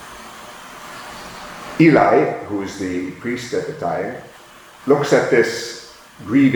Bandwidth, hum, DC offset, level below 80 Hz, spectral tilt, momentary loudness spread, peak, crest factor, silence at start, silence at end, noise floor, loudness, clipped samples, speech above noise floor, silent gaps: over 20 kHz; none; under 0.1%; -56 dBFS; -6 dB/octave; 22 LU; -2 dBFS; 18 dB; 0 s; 0 s; -43 dBFS; -18 LUFS; under 0.1%; 26 dB; none